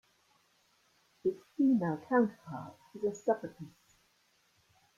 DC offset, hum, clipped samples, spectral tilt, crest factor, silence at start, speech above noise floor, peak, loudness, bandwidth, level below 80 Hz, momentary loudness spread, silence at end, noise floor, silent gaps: under 0.1%; none; under 0.1%; -7.5 dB/octave; 20 dB; 1.25 s; 39 dB; -16 dBFS; -33 LUFS; 7.4 kHz; -78 dBFS; 18 LU; 1.3 s; -72 dBFS; none